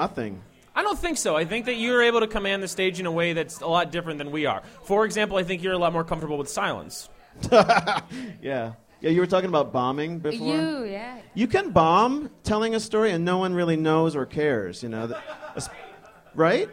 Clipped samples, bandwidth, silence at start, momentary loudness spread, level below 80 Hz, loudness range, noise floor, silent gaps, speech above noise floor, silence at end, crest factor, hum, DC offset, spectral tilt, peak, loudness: under 0.1%; 16 kHz; 0 s; 15 LU; -50 dBFS; 3 LU; -48 dBFS; none; 24 dB; 0 s; 20 dB; none; under 0.1%; -5 dB/octave; -4 dBFS; -24 LUFS